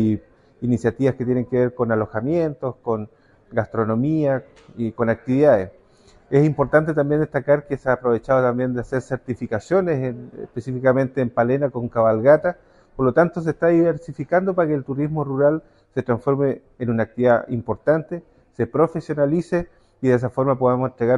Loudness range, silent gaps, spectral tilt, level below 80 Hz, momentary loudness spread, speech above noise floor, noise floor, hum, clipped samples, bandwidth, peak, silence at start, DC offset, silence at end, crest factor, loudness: 3 LU; none; -9 dB/octave; -50 dBFS; 11 LU; 33 dB; -53 dBFS; none; under 0.1%; 10.5 kHz; -2 dBFS; 0 s; under 0.1%; 0 s; 18 dB; -21 LUFS